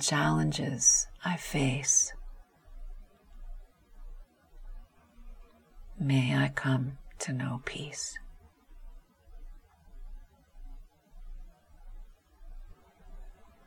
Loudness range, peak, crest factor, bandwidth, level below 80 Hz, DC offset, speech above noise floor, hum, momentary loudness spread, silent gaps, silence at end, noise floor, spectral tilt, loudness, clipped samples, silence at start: 15 LU; -12 dBFS; 22 dB; 18 kHz; -48 dBFS; under 0.1%; 24 dB; none; 27 LU; none; 0.2 s; -53 dBFS; -3.5 dB/octave; -29 LUFS; under 0.1%; 0 s